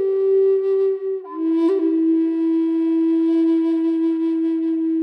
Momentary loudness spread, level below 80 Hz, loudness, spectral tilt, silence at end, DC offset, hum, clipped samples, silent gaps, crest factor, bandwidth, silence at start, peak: 4 LU; under -90 dBFS; -19 LUFS; -7 dB/octave; 0 s; under 0.1%; none; under 0.1%; none; 8 dB; 4.5 kHz; 0 s; -10 dBFS